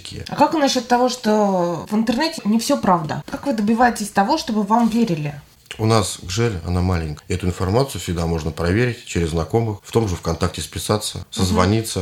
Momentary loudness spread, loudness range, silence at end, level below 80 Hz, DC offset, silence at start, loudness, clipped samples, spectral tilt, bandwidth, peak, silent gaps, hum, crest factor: 7 LU; 3 LU; 0 s; -40 dBFS; under 0.1%; 0 s; -20 LUFS; under 0.1%; -5.5 dB/octave; 16.5 kHz; 0 dBFS; none; none; 20 dB